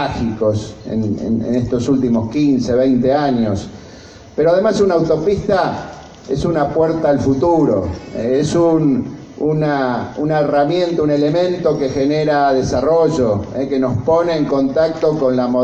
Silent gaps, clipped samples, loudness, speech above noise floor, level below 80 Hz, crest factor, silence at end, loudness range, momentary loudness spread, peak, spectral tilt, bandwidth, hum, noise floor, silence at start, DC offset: none; under 0.1%; -16 LUFS; 23 dB; -40 dBFS; 12 dB; 0 s; 1 LU; 7 LU; -2 dBFS; -7 dB/octave; 8.6 kHz; none; -38 dBFS; 0 s; under 0.1%